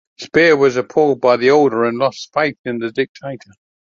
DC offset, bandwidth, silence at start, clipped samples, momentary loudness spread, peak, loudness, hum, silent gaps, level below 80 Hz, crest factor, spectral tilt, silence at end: under 0.1%; 7.4 kHz; 0.2 s; under 0.1%; 12 LU; -2 dBFS; -15 LUFS; none; 2.59-2.64 s, 3.09-3.15 s; -60 dBFS; 14 dB; -5.5 dB/octave; 0.55 s